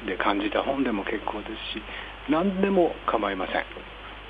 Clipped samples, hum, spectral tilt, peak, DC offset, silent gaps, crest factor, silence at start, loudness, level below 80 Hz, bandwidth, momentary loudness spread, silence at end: under 0.1%; none; -8 dB/octave; -8 dBFS; under 0.1%; none; 20 dB; 0 s; -27 LUFS; -48 dBFS; 5 kHz; 13 LU; 0 s